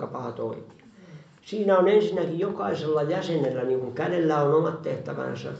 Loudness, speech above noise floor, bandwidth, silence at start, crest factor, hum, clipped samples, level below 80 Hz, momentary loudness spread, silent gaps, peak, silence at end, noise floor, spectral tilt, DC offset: -25 LUFS; 23 dB; 8 kHz; 0 s; 18 dB; none; under 0.1%; -70 dBFS; 12 LU; none; -8 dBFS; 0 s; -48 dBFS; -7.5 dB/octave; under 0.1%